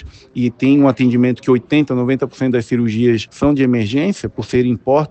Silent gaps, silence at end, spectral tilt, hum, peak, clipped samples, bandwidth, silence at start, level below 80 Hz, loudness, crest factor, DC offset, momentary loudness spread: none; 0.05 s; -7.5 dB/octave; none; -2 dBFS; under 0.1%; 8.6 kHz; 0 s; -44 dBFS; -15 LUFS; 14 dB; under 0.1%; 7 LU